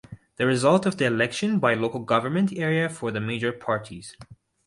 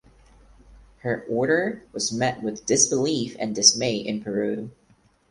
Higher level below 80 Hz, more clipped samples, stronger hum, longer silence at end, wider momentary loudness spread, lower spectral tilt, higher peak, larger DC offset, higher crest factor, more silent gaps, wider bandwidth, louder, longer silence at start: about the same, -62 dBFS vs -58 dBFS; neither; neither; second, 0.3 s vs 0.6 s; second, 8 LU vs 13 LU; first, -5.5 dB/octave vs -2.5 dB/octave; second, -6 dBFS vs 0 dBFS; neither; second, 18 dB vs 24 dB; neither; about the same, 11.5 kHz vs 11.5 kHz; about the same, -24 LUFS vs -23 LUFS; second, 0.1 s vs 0.7 s